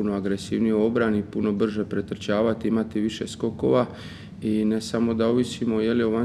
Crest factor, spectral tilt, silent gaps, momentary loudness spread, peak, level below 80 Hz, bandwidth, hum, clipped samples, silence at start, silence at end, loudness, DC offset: 16 dB; -6.5 dB/octave; none; 7 LU; -8 dBFS; -56 dBFS; 11.5 kHz; none; under 0.1%; 0 s; 0 s; -24 LUFS; under 0.1%